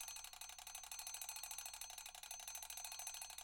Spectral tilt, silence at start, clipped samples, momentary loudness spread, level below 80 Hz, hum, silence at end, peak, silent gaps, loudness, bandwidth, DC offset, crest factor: 2.5 dB/octave; 0 s; under 0.1%; 4 LU; -76 dBFS; none; 0 s; -32 dBFS; none; -49 LUFS; over 20 kHz; under 0.1%; 20 dB